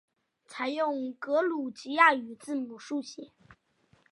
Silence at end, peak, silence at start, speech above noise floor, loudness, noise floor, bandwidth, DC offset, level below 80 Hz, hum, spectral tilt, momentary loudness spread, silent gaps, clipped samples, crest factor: 0.85 s; -8 dBFS; 0.5 s; 38 dB; -29 LUFS; -68 dBFS; 11.5 kHz; under 0.1%; -78 dBFS; none; -3 dB/octave; 15 LU; none; under 0.1%; 24 dB